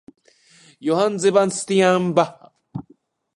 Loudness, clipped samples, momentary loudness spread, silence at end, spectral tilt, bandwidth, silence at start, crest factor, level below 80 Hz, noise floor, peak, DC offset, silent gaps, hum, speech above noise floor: -19 LUFS; under 0.1%; 19 LU; 0.55 s; -5 dB/octave; 11.5 kHz; 0.8 s; 20 dB; -64 dBFS; -57 dBFS; -2 dBFS; under 0.1%; none; none; 39 dB